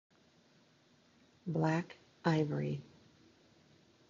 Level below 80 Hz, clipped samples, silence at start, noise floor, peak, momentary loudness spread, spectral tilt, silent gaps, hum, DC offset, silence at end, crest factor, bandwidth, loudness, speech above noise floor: -74 dBFS; under 0.1%; 1.45 s; -68 dBFS; -16 dBFS; 13 LU; -6.5 dB/octave; none; none; under 0.1%; 1.25 s; 24 dB; 7.4 kHz; -36 LUFS; 34 dB